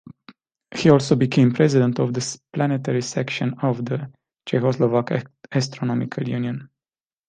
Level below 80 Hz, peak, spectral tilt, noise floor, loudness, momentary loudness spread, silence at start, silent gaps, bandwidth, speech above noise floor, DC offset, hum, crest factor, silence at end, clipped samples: -60 dBFS; -2 dBFS; -6.5 dB/octave; under -90 dBFS; -21 LUFS; 11 LU; 0.7 s; none; 9.6 kHz; over 70 dB; under 0.1%; none; 20 dB; 0.6 s; under 0.1%